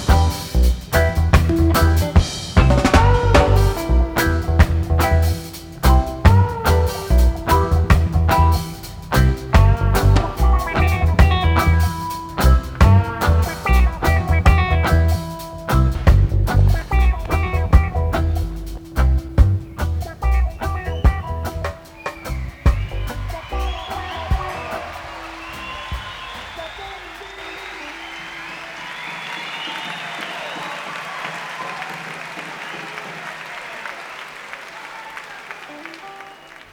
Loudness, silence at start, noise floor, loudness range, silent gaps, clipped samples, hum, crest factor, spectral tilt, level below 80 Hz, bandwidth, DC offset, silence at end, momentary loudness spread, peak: -18 LUFS; 0 s; -40 dBFS; 14 LU; none; under 0.1%; none; 18 dB; -6 dB/octave; -20 dBFS; 19 kHz; under 0.1%; 0.2 s; 16 LU; 0 dBFS